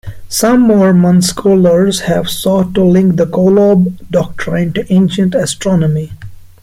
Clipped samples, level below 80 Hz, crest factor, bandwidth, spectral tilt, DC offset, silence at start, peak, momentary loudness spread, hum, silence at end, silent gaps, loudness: under 0.1%; -38 dBFS; 10 dB; 16 kHz; -6 dB/octave; under 0.1%; 0.05 s; 0 dBFS; 8 LU; none; 0.2 s; none; -11 LUFS